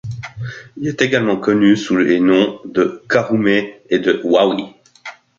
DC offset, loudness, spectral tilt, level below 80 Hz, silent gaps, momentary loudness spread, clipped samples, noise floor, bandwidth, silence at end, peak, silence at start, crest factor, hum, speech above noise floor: under 0.1%; -16 LUFS; -6 dB/octave; -54 dBFS; none; 16 LU; under 0.1%; -37 dBFS; 7.4 kHz; 0.25 s; 0 dBFS; 0.05 s; 16 dB; none; 22 dB